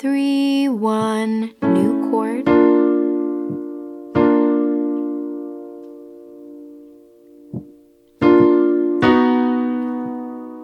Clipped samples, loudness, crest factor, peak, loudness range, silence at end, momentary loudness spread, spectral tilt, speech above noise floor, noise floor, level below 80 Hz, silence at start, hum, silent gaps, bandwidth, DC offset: under 0.1%; -17 LUFS; 16 dB; -2 dBFS; 9 LU; 0 s; 20 LU; -7 dB/octave; 33 dB; -50 dBFS; -54 dBFS; 0 s; none; none; 11.5 kHz; under 0.1%